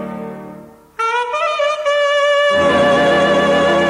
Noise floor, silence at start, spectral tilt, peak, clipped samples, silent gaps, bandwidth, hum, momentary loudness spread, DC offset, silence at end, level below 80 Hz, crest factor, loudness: -37 dBFS; 0 s; -4.5 dB/octave; -4 dBFS; under 0.1%; none; 11.5 kHz; none; 17 LU; under 0.1%; 0 s; -48 dBFS; 10 dB; -14 LUFS